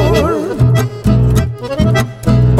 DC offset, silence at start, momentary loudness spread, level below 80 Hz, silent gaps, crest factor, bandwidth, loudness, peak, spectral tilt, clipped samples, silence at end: under 0.1%; 0 s; 4 LU; -22 dBFS; none; 10 dB; 14.5 kHz; -13 LUFS; 0 dBFS; -7 dB/octave; under 0.1%; 0 s